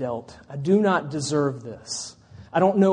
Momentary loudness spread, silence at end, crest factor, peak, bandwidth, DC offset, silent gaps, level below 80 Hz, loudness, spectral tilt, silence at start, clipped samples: 16 LU; 0 s; 16 dB; -6 dBFS; 10 kHz; under 0.1%; none; -60 dBFS; -24 LUFS; -5.5 dB/octave; 0 s; under 0.1%